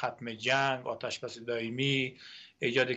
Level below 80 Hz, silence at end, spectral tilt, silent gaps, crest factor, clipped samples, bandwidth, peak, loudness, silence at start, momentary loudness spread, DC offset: -74 dBFS; 0 s; -4.5 dB/octave; none; 20 dB; under 0.1%; 8.4 kHz; -14 dBFS; -32 LUFS; 0 s; 10 LU; under 0.1%